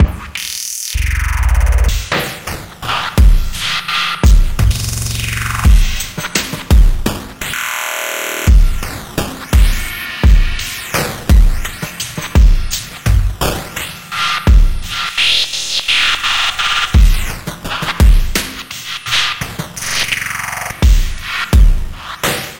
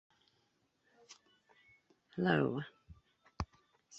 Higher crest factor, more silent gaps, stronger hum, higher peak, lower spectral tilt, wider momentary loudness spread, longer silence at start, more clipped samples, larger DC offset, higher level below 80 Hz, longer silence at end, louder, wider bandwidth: second, 12 dB vs 26 dB; neither; neither; first, 0 dBFS vs -16 dBFS; second, -3.5 dB/octave vs -5.5 dB/octave; second, 10 LU vs 27 LU; second, 0 s vs 1.1 s; neither; neither; first, -14 dBFS vs -60 dBFS; about the same, 0 s vs 0 s; first, -15 LUFS vs -37 LUFS; first, 17 kHz vs 8 kHz